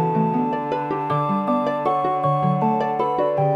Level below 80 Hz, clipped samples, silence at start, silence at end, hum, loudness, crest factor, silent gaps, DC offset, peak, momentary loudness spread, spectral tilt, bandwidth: -62 dBFS; under 0.1%; 0 s; 0 s; none; -21 LUFS; 12 dB; none; under 0.1%; -8 dBFS; 3 LU; -9 dB/octave; 7 kHz